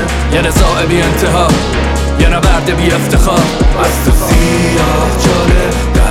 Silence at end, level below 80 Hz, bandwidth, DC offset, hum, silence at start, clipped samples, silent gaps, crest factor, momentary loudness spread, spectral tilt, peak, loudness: 0 s; -14 dBFS; 16.5 kHz; under 0.1%; none; 0 s; under 0.1%; none; 10 dB; 2 LU; -5 dB/octave; 0 dBFS; -11 LUFS